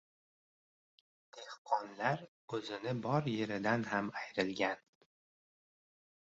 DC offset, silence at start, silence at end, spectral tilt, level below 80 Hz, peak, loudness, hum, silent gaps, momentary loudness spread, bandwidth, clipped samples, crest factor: under 0.1%; 1.35 s; 1.6 s; -4.5 dB/octave; -76 dBFS; -18 dBFS; -37 LUFS; none; 1.58-1.65 s, 2.28-2.48 s; 10 LU; 8 kHz; under 0.1%; 22 dB